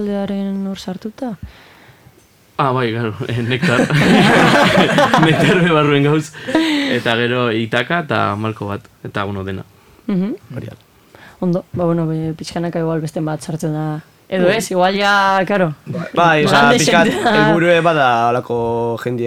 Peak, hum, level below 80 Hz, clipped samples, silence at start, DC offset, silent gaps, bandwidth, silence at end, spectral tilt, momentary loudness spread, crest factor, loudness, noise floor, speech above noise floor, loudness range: 0 dBFS; none; -48 dBFS; under 0.1%; 0 s; under 0.1%; none; 16 kHz; 0 s; -5.5 dB/octave; 15 LU; 16 dB; -15 LUFS; -49 dBFS; 34 dB; 10 LU